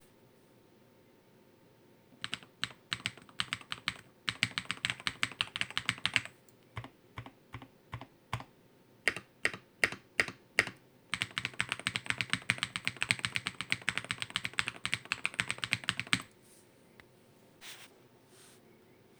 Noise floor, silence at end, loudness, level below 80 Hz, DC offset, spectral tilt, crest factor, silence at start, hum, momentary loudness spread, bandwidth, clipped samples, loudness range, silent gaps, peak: -63 dBFS; 0.65 s; -35 LUFS; -66 dBFS; under 0.1%; -2 dB/octave; 34 dB; 2.1 s; none; 17 LU; over 20 kHz; under 0.1%; 7 LU; none; -6 dBFS